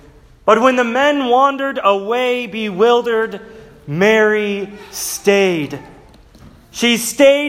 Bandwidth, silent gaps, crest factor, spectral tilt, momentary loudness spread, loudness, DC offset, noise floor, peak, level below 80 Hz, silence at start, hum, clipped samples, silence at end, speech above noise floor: 16.5 kHz; none; 16 dB; -3.5 dB/octave; 13 LU; -15 LUFS; under 0.1%; -43 dBFS; 0 dBFS; -52 dBFS; 0.45 s; none; under 0.1%; 0 s; 28 dB